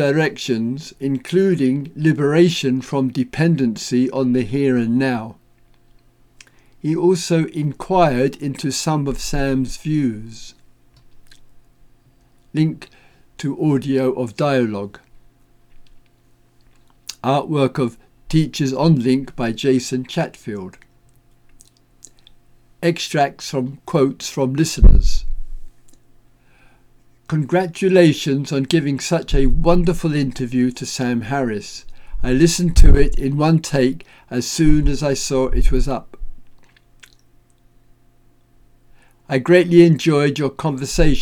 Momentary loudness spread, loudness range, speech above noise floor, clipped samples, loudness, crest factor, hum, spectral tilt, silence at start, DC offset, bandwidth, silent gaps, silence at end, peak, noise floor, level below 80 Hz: 11 LU; 8 LU; 38 dB; under 0.1%; -18 LUFS; 18 dB; none; -6 dB/octave; 0 s; under 0.1%; 13.5 kHz; none; 0 s; 0 dBFS; -54 dBFS; -24 dBFS